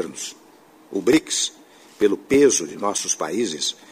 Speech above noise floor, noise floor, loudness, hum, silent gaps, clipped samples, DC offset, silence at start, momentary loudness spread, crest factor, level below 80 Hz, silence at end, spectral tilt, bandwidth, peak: 29 dB; -50 dBFS; -21 LUFS; none; none; under 0.1%; under 0.1%; 0 s; 13 LU; 18 dB; -60 dBFS; 0.15 s; -2.5 dB/octave; 15.5 kHz; -4 dBFS